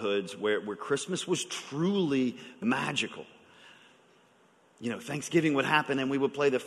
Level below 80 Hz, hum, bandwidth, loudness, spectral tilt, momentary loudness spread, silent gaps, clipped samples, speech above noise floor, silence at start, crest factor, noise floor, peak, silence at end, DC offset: -74 dBFS; none; 12.5 kHz; -30 LUFS; -4.5 dB/octave; 9 LU; none; under 0.1%; 34 dB; 0 s; 22 dB; -63 dBFS; -8 dBFS; 0 s; under 0.1%